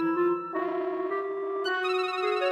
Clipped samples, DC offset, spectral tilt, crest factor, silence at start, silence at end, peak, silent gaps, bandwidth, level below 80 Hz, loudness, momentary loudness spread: under 0.1%; under 0.1%; -5 dB/octave; 12 dB; 0 s; 0 s; -16 dBFS; none; 10 kHz; -76 dBFS; -29 LUFS; 4 LU